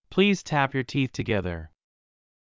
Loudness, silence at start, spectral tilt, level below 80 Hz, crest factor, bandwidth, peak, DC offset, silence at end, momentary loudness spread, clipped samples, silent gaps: -26 LUFS; 0.1 s; -6 dB/octave; -48 dBFS; 20 dB; 7.6 kHz; -6 dBFS; under 0.1%; 0.9 s; 9 LU; under 0.1%; none